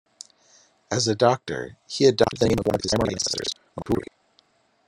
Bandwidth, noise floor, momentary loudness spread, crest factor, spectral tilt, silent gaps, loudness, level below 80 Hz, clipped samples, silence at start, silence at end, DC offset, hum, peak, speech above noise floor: 16 kHz; -63 dBFS; 14 LU; 22 dB; -4.5 dB/octave; none; -23 LUFS; -50 dBFS; under 0.1%; 0.9 s; 0.85 s; under 0.1%; none; -2 dBFS; 41 dB